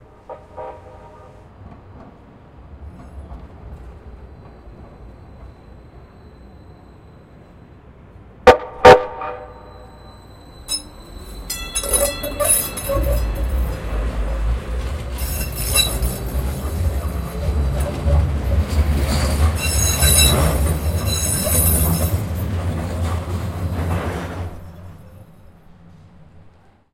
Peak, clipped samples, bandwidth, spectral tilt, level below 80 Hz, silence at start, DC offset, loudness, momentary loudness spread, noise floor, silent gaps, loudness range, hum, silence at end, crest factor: 0 dBFS; under 0.1%; 16.5 kHz; -4 dB/octave; -26 dBFS; 0.3 s; under 0.1%; -18 LUFS; 26 LU; -49 dBFS; none; 23 LU; none; 0.45 s; 20 dB